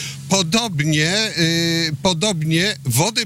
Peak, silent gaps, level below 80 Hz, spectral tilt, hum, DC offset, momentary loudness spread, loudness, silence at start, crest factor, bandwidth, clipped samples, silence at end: -8 dBFS; none; -50 dBFS; -3.5 dB/octave; none; under 0.1%; 2 LU; -18 LUFS; 0 s; 12 dB; 16 kHz; under 0.1%; 0 s